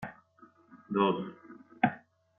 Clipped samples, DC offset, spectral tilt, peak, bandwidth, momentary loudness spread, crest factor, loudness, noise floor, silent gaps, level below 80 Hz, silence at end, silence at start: under 0.1%; under 0.1%; -4.5 dB/octave; -10 dBFS; 3.9 kHz; 23 LU; 24 dB; -31 LUFS; -61 dBFS; none; -72 dBFS; 0.4 s; 0 s